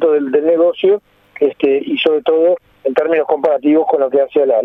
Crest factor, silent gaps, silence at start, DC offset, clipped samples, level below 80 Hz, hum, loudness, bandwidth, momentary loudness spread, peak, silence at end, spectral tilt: 14 dB; none; 0 s; under 0.1%; under 0.1%; -64 dBFS; none; -14 LUFS; 4.1 kHz; 5 LU; 0 dBFS; 0 s; -7 dB/octave